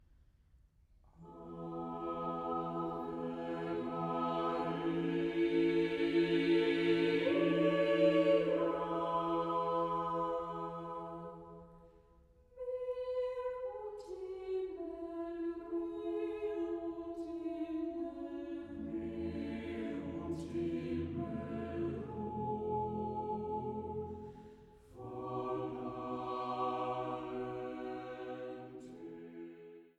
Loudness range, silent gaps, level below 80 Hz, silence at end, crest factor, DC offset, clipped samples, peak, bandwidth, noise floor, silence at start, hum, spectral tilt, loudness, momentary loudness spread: 11 LU; none; -64 dBFS; 0.1 s; 20 dB; under 0.1%; under 0.1%; -18 dBFS; 8.4 kHz; -67 dBFS; 1.2 s; none; -7.5 dB/octave; -37 LUFS; 15 LU